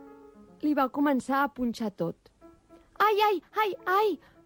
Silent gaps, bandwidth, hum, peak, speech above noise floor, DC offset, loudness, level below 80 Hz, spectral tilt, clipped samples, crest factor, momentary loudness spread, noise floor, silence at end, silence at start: none; 17 kHz; none; -12 dBFS; 29 dB; under 0.1%; -28 LUFS; -64 dBFS; -5.5 dB/octave; under 0.1%; 16 dB; 8 LU; -56 dBFS; 0.3 s; 0 s